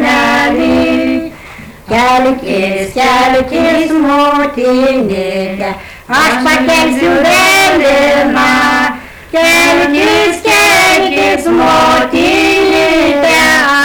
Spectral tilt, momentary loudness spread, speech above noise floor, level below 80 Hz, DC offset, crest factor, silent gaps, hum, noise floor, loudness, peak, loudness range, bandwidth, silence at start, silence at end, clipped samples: -3 dB/octave; 9 LU; 22 dB; -36 dBFS; under 0.1%; 6 dB; none; none; -30 dBFS; -9 LUFS; -4 dBFS; 3 LU; over 20 kHz; 0 s; 0 s; under 0.1%